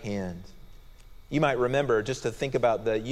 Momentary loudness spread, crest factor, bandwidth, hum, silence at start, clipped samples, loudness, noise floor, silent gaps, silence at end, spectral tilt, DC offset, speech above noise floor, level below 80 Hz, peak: 10 LU; 18 dB; 14 kHz; none; 0 s; under 0.1%; -27 LUFS; -48 dBFS; none; 0 s; -6 dB/octave; under 0.1%; 21 dB; -50 dBFS; -10 dBFS